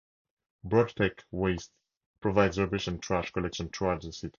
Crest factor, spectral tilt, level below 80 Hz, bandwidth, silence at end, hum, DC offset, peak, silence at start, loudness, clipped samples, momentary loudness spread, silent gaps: 22 dB; -6 dB/octave; -50 dBFS; 7.4 kHz; 0.1 s; none; under 0.1%; -8 dBFS; 0.65 s; -30 LUFS; under 0.1%; 9 LU; 1.97-2.14 s